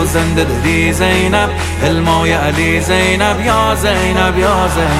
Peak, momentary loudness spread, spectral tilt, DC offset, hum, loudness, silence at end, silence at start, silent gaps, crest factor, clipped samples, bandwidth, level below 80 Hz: 0 dBFS; 2 LU; -5 dB/octave; under 0.1%; none; -12 LUFS; 0 s; 0 s; none; 12 dB; under 0.1%; 16 kHz; -22 dBFS